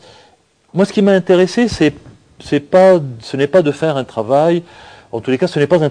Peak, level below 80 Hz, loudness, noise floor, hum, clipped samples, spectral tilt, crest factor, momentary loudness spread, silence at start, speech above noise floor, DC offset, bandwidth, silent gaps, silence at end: 0 dBFS; -48 dBFS; -14 LUFS; -52 dBFS; none; under 0.1%; -6.5 dB/octave; 14 dB; 10 LU; 0.75 s; 39 dB; under 0.1%; 10 kHz; none; 0 s